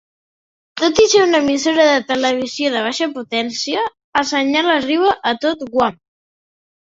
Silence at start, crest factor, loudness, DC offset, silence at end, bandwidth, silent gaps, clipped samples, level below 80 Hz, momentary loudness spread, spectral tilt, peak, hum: 0.75 s; 16 dB; -16 LUFS; under 0.1%; 1 s; 8 kHz; 4.04-4.13 s; under 0.1%; -54 dBFS; 8 LU; -2.5 dB/octave; -2 dBFS; none